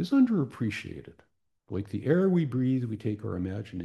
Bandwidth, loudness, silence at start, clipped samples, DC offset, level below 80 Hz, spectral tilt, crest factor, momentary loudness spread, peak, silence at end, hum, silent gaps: 11.5 kHz; -29 LUFS; 0 s; under 0.1%; under 0.1%; -66 dBFS; -8.5 dB/octave; 16 dB; 14 LU; -12 dBFS; 0 s; none; none